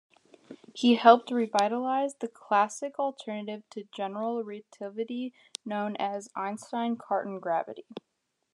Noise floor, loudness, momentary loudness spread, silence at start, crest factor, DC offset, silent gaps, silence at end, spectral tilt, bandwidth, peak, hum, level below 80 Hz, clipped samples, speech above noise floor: -52 dBFS; -29 LUFS; 18 LU; 0.5 s; 26 dB; under 0.1%; none; 0.55 s; -4.5 dB/octave; 11 kHz; -2 dBFS; none; under -90 dBFS; under 0.1%; 23 dB